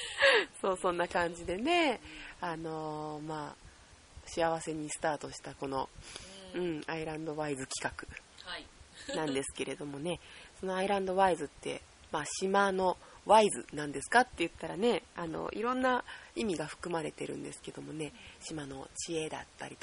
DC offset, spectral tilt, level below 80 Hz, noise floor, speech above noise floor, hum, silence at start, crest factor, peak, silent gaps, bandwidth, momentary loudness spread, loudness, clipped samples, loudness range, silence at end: under 0.1%; -3.5 dB/octave; -60 dBFS; -57 dBFS; 23 dB; none; 0 s; 24 dB; -12 dBFS; none; 10.5 kHz; 16 LU; -34 LUFS; under 0.1%; 8 LU; 0.1 s